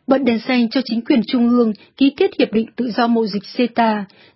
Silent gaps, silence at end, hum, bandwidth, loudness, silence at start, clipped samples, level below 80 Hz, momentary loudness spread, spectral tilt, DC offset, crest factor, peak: none; 0.3 s; none; 5.8 kHz; -17 LUFS; 0.1 s; under 0.1%; -60 dBFS; 5 LU; -10 dB/octave; under 0.1%; 16 dB; -2 dBFS